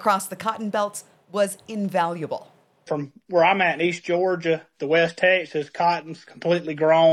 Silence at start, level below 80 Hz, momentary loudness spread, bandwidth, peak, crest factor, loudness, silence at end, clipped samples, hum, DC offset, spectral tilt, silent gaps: 0 s; -74 dBFS; 12 LU; 14.5 kHz; -6 dBFS; 16 dB; -23 LUFS; 0 s; under 0.1%; none; under 0.1%; -4.5 dB/octave; none